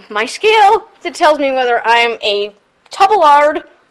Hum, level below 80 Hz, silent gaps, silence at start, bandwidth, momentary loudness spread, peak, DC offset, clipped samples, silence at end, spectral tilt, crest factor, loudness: none; -54 dBFS; none; 0.1 s; 13 kHz; 14 LU; 0 dBFS; under 0.1%; under 0.1%; 0.3 s; -1.5 dB/octave; 12 dB; -11 LUFS